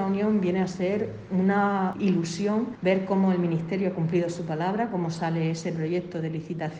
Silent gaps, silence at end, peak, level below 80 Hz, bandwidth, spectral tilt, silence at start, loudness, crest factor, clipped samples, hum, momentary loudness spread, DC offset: none; 0 s; -10 dBFS; -62 dBFS; 9 kHz; -7 dB/octave; 0 s; -26 LUFS; 14 dB; under 0.1%; none; 6 LU; under 0.1%